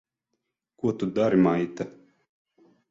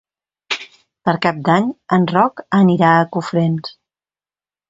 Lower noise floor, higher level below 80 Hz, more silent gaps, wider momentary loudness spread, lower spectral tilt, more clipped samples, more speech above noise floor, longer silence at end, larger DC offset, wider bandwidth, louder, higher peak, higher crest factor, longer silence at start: second, -81 dBFS vs under -90 dBFS; about the same, -64 dBFS vs -60 dBFS; neither; about the same, 14 LU vs 12 LU; about the same, -8 dB/octave vs -7 dB/octave; neither; second, 57 dB vs over 75 dB; about the same, 1 s vs 1 s; neither; about the same, 7.6 kHz vs 7.8 kHz; second, -25 LUFS vs -16 LUFS; second, -8 dBFS vs 0 dBFS; about the same, 18 dB vs 18 dB; first, 0.85 s vs 0.5 s